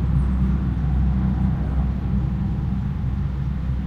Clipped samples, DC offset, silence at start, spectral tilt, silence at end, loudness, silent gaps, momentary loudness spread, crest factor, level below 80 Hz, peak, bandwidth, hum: under 0.1%; under 0.1%; 0 s; -10 dB/octave; 0 s; -23 LUFS; none; 4 LU; 12 dB; -24 dBFS; -10 dBFS; 4.2 kHz; none